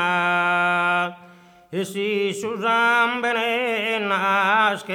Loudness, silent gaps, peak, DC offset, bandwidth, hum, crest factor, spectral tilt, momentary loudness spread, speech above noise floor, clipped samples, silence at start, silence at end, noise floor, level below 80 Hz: -20 LUFS; none; -6 dBFS; under 0.1%; 18.5 kHz; none; 16 dB; -4 dB/octave; 8 LU; 27 dB; under 0.1%; 0 s; 0 s; -49 dBFS; -72 dBFS